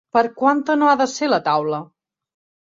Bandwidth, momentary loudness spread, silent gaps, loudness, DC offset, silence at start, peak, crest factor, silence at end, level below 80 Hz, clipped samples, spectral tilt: 7.8 kHz; 6 LU; none; -18 LUFS; under 0.1%; 0.15 s; -2 dBFS; 16 dB; 0.75 s; -68 dBFS; under 0.1%; -4.5 dB/octave